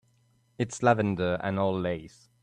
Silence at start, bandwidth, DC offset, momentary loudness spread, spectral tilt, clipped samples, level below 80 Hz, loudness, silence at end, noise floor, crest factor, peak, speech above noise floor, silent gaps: 0.6 s; 11 kHz; under 0.1%; 10 LU; -6.5 dB/octave; under 0.1%; -62 dBFS; -28 LUFS; 0.35 s; -67 dBFS; 20 dB; -8 dBFS; 39 dB; none